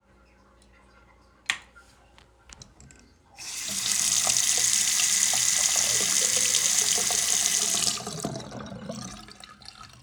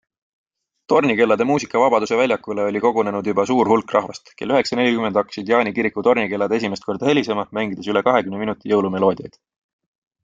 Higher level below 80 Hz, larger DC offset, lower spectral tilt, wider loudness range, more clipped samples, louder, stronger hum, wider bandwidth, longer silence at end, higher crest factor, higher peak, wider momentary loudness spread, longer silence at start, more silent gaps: about the same, -58 dBFS vs -60 dBFS; neither; second, 0.5 dB/octave vs -5.5 dB/octave; first, 17 LU vs 2 LU; neither; second, -22 LUFS vs -19 LUFS; neither; first, over 20 kHz vs 7.6 kHz; second, 0.15 s vs 0.95 s; first, 24 dB vs 18 dB; about the same, -4 dBFS vs -2 dBFS; first, 18 LU vs 6 LU; first, 1.5 s vs 0.9 s; neither